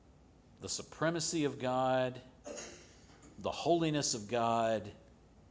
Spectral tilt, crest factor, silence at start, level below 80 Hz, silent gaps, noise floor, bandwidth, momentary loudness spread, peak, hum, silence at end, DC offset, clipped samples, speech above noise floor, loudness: -4 dB/octave; 18 dB; 0.6 s; -64 dBFS; none; -62 dBFS; 8 kHz; 17 LU; -18 dBFS; none; 0.5 s; under 0.1%; under 0.1%; 27 dB; -34 LUFS